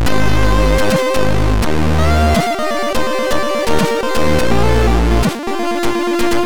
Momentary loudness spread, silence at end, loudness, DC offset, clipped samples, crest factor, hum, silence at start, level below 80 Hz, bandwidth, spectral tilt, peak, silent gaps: 4 LU; 0 s; -15 LUFS; 10%; under 0.1%; 10 dB; none; 0 s; -20 dBFS; 19 kHz; -5.5 dB/octave; -4 dBFS; none